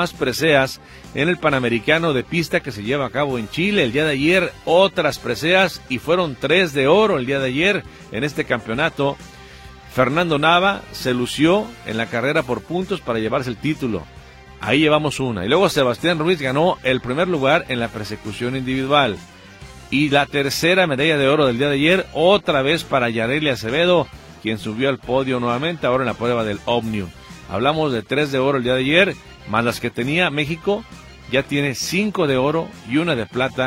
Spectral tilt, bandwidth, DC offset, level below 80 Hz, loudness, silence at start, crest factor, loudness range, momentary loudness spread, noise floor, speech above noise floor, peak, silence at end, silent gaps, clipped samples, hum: -5 dB/octave; 16.5 kHz; under 0.1%; -46 dBFS; -19 LUFS; 0 s; 18 dB; 4 LU; 9 LU; -40 dBFS; 21 dB; -2 dBFS; 0 s; none; under 0.1%; none